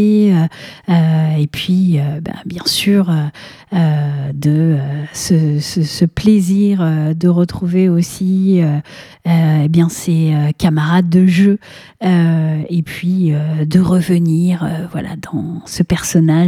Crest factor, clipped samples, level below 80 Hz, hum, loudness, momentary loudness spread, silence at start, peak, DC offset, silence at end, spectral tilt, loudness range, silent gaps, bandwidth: 14 dB; under 0.1%; -44 dBFS; none; -14 LUFS; 9 LU; 0 s; 0 dBFS; under 0.1%; 0 s; -6.5 dB/octave; 2 LU; none; 15 kHz